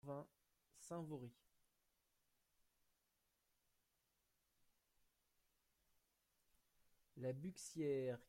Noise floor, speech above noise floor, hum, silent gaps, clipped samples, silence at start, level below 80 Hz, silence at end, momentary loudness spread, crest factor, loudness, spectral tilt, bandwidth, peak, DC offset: -87 dBFS; 39 dB; none; none; under 0.1%; 0.05 s; -86 dBFS; 0.05 s; 19 LU; 20 dB; -49 LUFS; -6 dB/octave; 16 kHz; -34 dBFS; under 0.1%